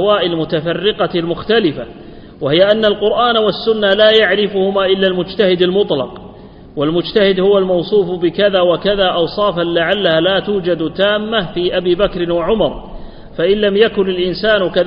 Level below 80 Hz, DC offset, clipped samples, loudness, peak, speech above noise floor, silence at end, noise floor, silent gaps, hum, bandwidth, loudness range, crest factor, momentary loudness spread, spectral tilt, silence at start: -38 dBFS; under 0.1%; under 0.1%; -14 LUFS; 0 dBFS; 22 dB; 0 s; -35 dBFS; none; none; 5.4 kHz; 3 LU; 14 dB; 7 LU; -8 dB/octave; 0 s